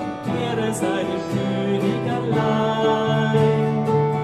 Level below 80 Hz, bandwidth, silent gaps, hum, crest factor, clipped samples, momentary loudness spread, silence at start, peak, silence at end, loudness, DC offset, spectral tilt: -54 dBFS; 13 kHz; none; none; 14 dB; under 0.1%; 6 LU; 0 s; -6 dBFS; 0 s; -21 LUFS; under 0.1%; -6.5 dB/octave